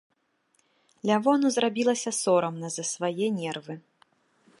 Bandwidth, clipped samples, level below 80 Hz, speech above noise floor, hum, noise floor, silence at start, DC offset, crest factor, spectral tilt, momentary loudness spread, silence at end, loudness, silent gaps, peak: 11.5 kHz; under 0.1%; -80 dBFS; 45 dB; none; -70 dBFS; 1.05 s; under 0.1%; 18 dB; -4 dB/octave; 11 LU; 0.8 s; -26 LUFS; none; -10 dBFS